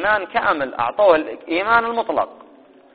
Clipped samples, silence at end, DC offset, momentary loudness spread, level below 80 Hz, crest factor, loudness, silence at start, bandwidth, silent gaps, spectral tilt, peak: under 0.1%; 0.6 s; 0.2%; 8 LU; -54 dBFS; 20 dB; -19 LUFS; 0 s; 4.8 kHz; none; -1.5 dB/octave; 0 dBFS